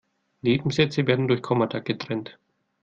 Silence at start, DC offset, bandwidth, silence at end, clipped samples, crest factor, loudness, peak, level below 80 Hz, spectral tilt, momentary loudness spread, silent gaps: 0.45 s; under 0.1%; 7.8 kHz; 0.5 s; under 0.1%; 20 dB; -24 LUFS; -6 dBFS; -60 dBFS; -6.5 dB/octave; 9 LU; none